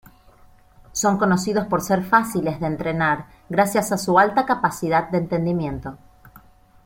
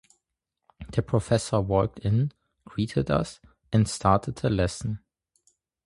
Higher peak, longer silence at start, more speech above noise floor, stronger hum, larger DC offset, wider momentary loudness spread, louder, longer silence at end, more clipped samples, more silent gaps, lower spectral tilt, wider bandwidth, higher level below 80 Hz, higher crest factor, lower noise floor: first, -2 dBFS vs -6 dBFS; first, 0.95 s vs 0.8 s; second, 30 dB vs 58 dB; neither; neither; second, 8 LU vs 11 LU; first, -21 LUFS vs -26 LUFS; second, 0.45 s vs 0.9 s; neither; neither; about the same, -5.5 dB/octave vs -6.5 dB/octave; first, 16.5 kHz vs 11.5 kHz; second, -50 dBFS vs -44 dBFS; about the same, 20 dB vs 22 dB; second, -51 dBFS vs -83 dBFS